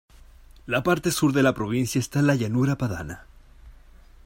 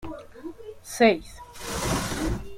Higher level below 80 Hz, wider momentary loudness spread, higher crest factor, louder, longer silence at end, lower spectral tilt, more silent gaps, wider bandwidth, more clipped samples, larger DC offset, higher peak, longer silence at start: second, -48 dBFS vs -40 dBFS; second, 10 LU vs 21 LU; second, 16 dB vs 22 dB; about the same, -24 LUFS vs -25 LUFS; first, 0.55 s vs 0 s; about the same, -5.5 dB/octave vs -4.5 dB/octave; neither; about the same, 16.5 kHz vs 16.5 kHz; neither; neither; about the same, -8 dBFS vs -6 dBFS; first, 0.65 s vs 0 s